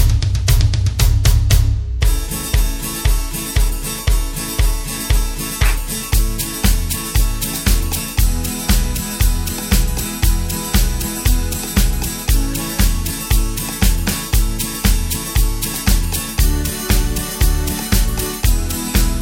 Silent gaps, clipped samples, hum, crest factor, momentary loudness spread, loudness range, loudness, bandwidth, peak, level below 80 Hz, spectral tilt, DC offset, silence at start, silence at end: none; under 0.1%; none; 16 dB; 5 LU; 2 LU; -18 LUFS; 17 kHz; 0 dBFS; -18 dBFS; -4 dB/octave; under 0.1%; 0 s; 0 s